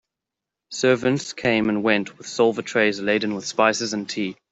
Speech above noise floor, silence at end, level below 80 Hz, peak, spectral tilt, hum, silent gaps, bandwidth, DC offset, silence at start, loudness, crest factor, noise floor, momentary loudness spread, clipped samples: 64 dB; 0.2 s; -62 dBFS; -2 dBFS; -4 dB/octave; none; none; 8.2 kHz; under 0.1%; 0.7 s; -22 LUFS; 20 dB; -86 dBFS; 7 LU; under 0.1%